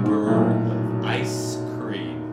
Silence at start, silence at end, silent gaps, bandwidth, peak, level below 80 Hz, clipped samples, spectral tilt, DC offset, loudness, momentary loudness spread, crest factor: 0 s; 0 s; none; 15 kHz; -8 dBFS; -60 dBFS; under 0.1%; -6.5 dB/octave; under 0.1%; -23 LUFS; 9 LU; 14 dB